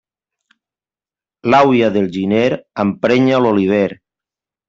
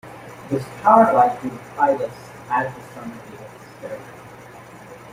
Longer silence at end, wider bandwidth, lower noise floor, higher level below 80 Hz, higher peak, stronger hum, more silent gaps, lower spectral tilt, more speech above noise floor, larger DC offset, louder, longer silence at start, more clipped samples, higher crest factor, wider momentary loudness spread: first, 0.75 s vs 0 s; second, 7.6 kHz vs 16 kHz; first, under -90 dBFS vs -41 dBFS; about the same, -56 dBFS vs -60 dBFS; about the same, -2 dBFS vs -2 dBFS; neither; neither; about the same, -7 dB/octave vs -6.5 dB/octave; first, over 76 dB vs 22 dB; neither; first, -14 LUFS vs -19 LUFS; first, 1.45 s vs 0.05 s; neither; second, 14 dB vs 20 dB; second, 8 LU vs 26 LU